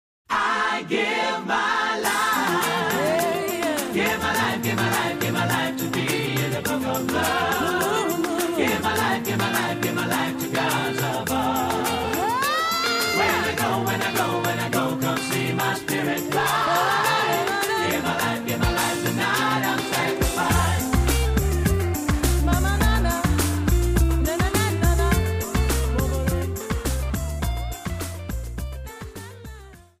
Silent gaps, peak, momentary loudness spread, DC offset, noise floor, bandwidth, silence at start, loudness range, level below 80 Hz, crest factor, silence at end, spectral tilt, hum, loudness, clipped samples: none; -8 dBFS; 6 LU; under 0.1%; -43 dBFS; 15.5 kHz; 0.3 s; 2 LU; -30 dBFS; 16 dB; 0.2 s; -4.5 dB/octave; none; -23 LUFS; under 0.1%